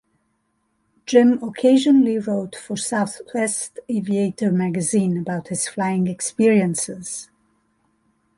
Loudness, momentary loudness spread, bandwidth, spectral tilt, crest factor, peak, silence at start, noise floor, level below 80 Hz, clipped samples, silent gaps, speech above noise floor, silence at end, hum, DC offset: -20 LUFS; 11 LU; 11.5 kHz; -5.5 dB/octave; 18 dB; -2 dBFS; 1.1 s; -69 dBFS; -64 dBFS; under 0.1%; none; 50 dB; 1.15 s; none; under 0.1%